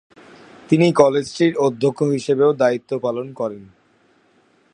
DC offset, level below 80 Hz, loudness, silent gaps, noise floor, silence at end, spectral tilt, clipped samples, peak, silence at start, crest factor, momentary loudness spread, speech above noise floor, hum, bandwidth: under 0.1%; -62 dBFS; -18 LUFS; none; -58 dBFS; 1.1 s; -6.5 dB/octave; under 0.1%; 0 dBFS; 0.7 s; 20 dB; 12 LU; 40 dB; none; 11 kHz